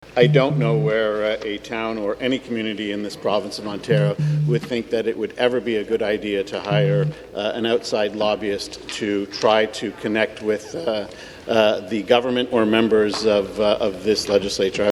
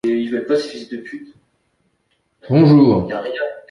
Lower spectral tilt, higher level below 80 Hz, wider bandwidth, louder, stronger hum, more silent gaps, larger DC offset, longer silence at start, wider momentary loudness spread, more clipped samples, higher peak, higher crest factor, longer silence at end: second, -6 dB/octave vs -8.5 dB/octave; about the same, -52 dBFS vs -50 dBFS; first, 12.5 kHz vs 10.5 kHz; second, -21 LUFS vs -16 LUFS; neither; neither; neither; about the same, 0 s vs 0.05 s; second, 8 LU vs 20 LU; neither; about the same, 0 dBFS vs -2 dBFS; about the same, 20 dB vs 16 dB; about the same, 0 s vs 0.1 s